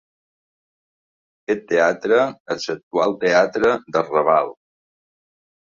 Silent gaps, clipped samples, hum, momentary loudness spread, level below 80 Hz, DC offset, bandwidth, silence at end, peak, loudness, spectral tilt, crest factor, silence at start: 2.40-2.46 s, 2.83-2.91 s; under 0.1%; none; 9 LU; -62 dBFS; under 0.1%; 7.4 kHz; 1.25 s; -2 dBFS; -19 LUFS; -4.5 dB/octave; 18 dB; 1.5 s